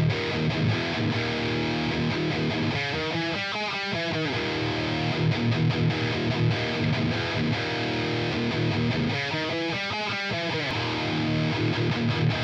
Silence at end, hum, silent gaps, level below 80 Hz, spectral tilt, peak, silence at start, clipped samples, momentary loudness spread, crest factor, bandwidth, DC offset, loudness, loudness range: 0 s; none; none; -50 dBFS; -6 dB/octave; -14 dBFS; 0 s; under 0.1%; 2 LU; 12 dB; 8.2 kHz; under 0.1%; -26 LUFS; 1 LU